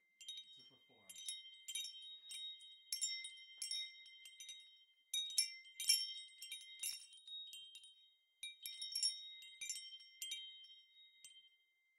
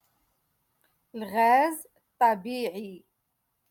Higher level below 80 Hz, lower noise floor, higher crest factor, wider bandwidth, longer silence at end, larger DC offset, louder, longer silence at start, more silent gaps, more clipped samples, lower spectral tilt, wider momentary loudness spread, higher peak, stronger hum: second, under -90 dBFS vs -78 dBFS; about the same, -78 dBFS vs -78 dBFS; first, 30 dB vs 18 dB; about the same, 16 kHz vs 17.5 kHz; second, 0.5 s vs 0.7 s; neither; second, -44 LUFS vs -25 LUFS; second, 0.2 s vs 1.15 s; neither; neither; second, 5.5 dB/octave vs -4 dB/octave; about the same, 21 LU vs 19 LU; second, -20 dBFS vs -10 dBFS; neither